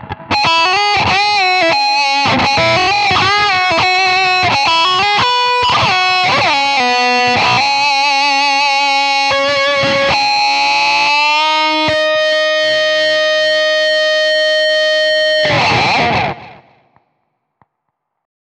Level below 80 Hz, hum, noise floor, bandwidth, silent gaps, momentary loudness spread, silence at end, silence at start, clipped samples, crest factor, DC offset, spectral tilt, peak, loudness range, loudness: -46 dBFS; none; -72 dBFS; 10.5 kHz; none; 2 LU; 2.05 s; 0 s; under 0.1%; 12 dB; under 0.1%; -2.5 dB/octave; -2 dBFS; 2 LU; -11 LUFS